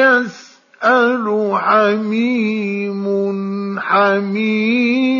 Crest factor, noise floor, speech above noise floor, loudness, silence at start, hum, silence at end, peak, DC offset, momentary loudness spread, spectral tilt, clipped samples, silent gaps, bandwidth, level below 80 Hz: 14 dB; -41 dBFS; 26 dB; -16 LUFS; 0 s; none; 0 s; -2 dBFS; under 0.1%; 7 LU; -6.5 dB/octave; under 0.1%; none; 7.2 kHz; -74 dBFS